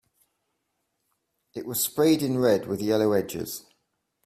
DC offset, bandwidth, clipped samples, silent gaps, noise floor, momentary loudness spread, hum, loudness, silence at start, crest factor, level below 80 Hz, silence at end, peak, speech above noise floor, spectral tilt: under 0.1%; 16 kHz; under 0.1%; none; -78 dBFS; 16 LU; none; -25 LUFS; 1.55 s; 18 dB; -64 dBFS; 0.65 s; -8 dBFS; 53 dB; -5 dB/octave